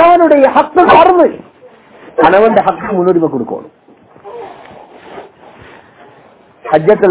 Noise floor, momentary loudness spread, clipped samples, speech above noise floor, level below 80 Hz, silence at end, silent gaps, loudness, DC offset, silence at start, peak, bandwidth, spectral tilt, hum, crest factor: -43 dBFS; 24 LU; 2%; 34 dB; -46 dBFS; 0 s; none; -9 LUFS; under 0.1%; 0 s; 0 dBFS; 4 kHz; -10 dB/octave; none; 12 dB